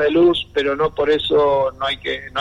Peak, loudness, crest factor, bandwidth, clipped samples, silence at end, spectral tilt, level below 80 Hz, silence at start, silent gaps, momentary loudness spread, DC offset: -6 dBFS; -18 LUFS; 12 dB; 11 kHz; under 0.1%; 0 s; -6 dB/octave; -44 dBFS; 0 s; none; 7 LU; under 0.1%